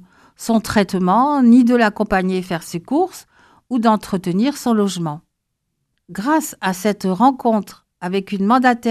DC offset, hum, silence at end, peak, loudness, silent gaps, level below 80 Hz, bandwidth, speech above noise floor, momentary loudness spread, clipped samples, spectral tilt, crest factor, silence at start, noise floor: under 0.1%; none; 0 s; -2 dBFS; -17 LUFS; none; -50 dBFS; 14.5 kHz; 57 dB; 12 LU; under 0.1%; -6 dB/octave; 16 dB; 0.4 s; -74 dBFS